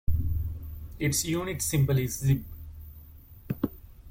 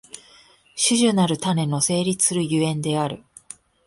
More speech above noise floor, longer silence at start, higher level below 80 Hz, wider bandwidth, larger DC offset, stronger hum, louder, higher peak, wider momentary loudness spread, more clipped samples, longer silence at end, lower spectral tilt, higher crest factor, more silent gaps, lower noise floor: second, 22 dB vs 32 dB; about the same, 0.1 s vs 0.15 s; first, -40 dBFS vs -60 dBFS; first, 16.5 kHz vs 12 kHz; neither; neither; second, -29 LUFS vs -21 LUFS; second, -12 dBFS vs -6 dBFS; second, 19 LU vs 23 LU; neither; second, 0 s vs 0.7 s; about the same, -5 dB/octave vs -4 dB/octave; about the same, 16 dB vs 18 dB; neither; second, -49 dBFS vs -53 dBFS